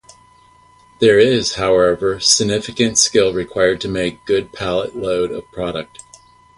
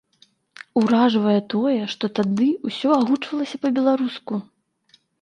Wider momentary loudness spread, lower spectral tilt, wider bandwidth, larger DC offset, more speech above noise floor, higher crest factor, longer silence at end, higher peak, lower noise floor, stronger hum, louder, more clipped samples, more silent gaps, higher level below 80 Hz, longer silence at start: first, 12 LU vs 9 LU; second, -3 dB/octave vs -6.5 dB/octave; first, 11.5 kHz vs 9.4 kHz; neither; second, 33 dB vs 40 dB; about the same, 18 dB vs 16 dB; about the same, 0.75 s vs 0.8 s; first, 0 dBFS vs -6 dBFS; second, -49 dBFS vs -60 dBFS; neither; first, -16 LUFS vs -21 LUFS; neither; neither; first, -46 dBFS vs -70 dBFS; first, 1 s vs 0.6 s